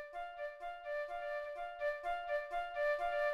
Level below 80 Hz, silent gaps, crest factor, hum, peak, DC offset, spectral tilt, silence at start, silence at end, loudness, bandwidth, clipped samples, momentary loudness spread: -62 dBFS; none; 14 dB; none; -26 dBFS; under 0.1%; -2.5 dB/octave; 0 s; 0 s; -40 LUFS; 12 kHz; under 0.1%; 9 LU